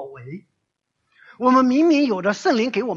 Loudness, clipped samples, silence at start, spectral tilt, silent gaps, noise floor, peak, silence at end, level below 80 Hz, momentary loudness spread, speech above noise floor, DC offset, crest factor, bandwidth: -18 LUFS; under 0.1%; 0 s; -5.5 dB/octave; none; -76 dBFS; -4 dBFS; 0 s; -68 dBFS; 22 LU; 57 dB; under 0.1%; 16 dB; 7.6 kHz